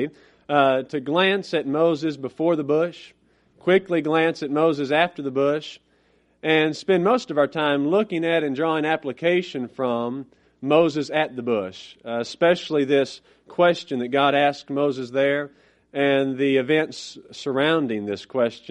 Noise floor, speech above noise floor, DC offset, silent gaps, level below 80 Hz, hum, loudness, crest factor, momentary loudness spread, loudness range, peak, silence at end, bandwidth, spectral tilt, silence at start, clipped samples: -62 dBFS; 40 dB; under 0.1%; none; -68 dBFS; none; -22 LUFS; 20 dB; 10 LU; 2 LU; -4 dBFS; 0 s; 10 kHz; -6 dB/octave; 0 s; under 0.1%